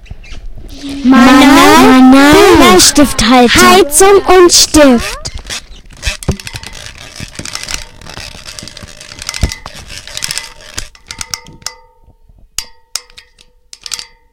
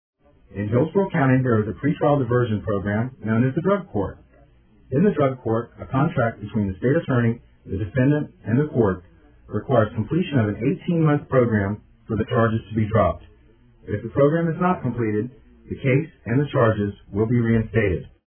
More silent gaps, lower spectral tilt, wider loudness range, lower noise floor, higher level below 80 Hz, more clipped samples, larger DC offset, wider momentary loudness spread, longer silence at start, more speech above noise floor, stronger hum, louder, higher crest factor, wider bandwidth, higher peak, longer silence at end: neither; second, -3 dB/octave vs -12.5 dB/octave; first, 19 LU vs 2 LU; second, -45 dBFS vs -53 dBFS; first, -28 dBFS vs -46 dBFS; first, 3% vs under 0.1%; neither; first, 24 LU vs 9 LU; second, 0.1 s vs 0.55 s; first, 40 dB vs 32 dB; neither; first, -5 LUFS vs -22 LUFS; second, 10 dB vs 18 dB; first, over 20 kHz vs 3.5 kHz; first, 0 dBFS vs -4 dBFS; about the same, 0.3 s vs 0.2 s